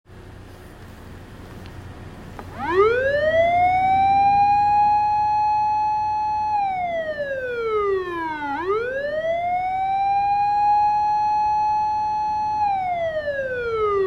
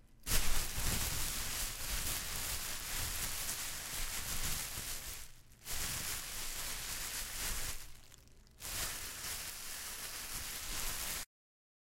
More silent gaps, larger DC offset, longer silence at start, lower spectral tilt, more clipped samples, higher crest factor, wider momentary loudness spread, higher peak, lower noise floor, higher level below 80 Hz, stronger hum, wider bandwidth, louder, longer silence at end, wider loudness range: neither; neither; about the same, 0.1 s vs 0.05 s; first, -6 dB/octave vs -1 dB/octave; neither; second, 14 dB vs 22 dB; first, 21 LU vs 7 LU; first, -8 dBFS vs -18 dBFS; second, -41 dBFS vs -59 dBFS; about the same, -48 dBFS vs -44 dBFS; neither; second, 7.4 kHz vs 16 kHz; first, -21 LUFS vs -39 LUFS; second, 0 s vs 0.65 s; about the same, 6 LU vs 4 LU